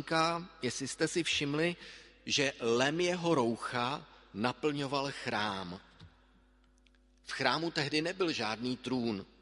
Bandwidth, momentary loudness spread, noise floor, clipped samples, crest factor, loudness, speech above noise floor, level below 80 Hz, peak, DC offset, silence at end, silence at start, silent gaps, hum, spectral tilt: 11.5 kHz; 12 LU; -65 dBFS; under 0.1%; 22 dB; -33 LUFS; 32 dB; -66 dBFS; -12 dBFS; under 0.1%; 0.15 s; 0 s; none; none; -4 dB/octave